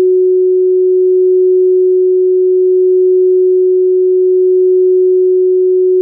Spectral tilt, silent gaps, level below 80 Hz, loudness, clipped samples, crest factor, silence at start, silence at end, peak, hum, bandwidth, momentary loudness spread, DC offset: -16 dB/octave; none; under -90 dBFS; -10 LUFS; under 0.1%; 4 dB; 0 s; 0 s; -6 dBFS; none; 0.5 kHz; 1 LU; under 0.1%